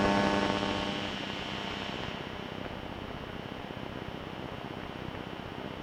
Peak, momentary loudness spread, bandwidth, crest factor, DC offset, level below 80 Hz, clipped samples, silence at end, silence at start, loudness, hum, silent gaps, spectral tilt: -12 dBFS; 11 LU; 16 kHz; 24 dB; under 0.1%; -52 dBFS; under 0.1%; 0 s; 0 s; -35 LUFS; none; none; -5 dB/octave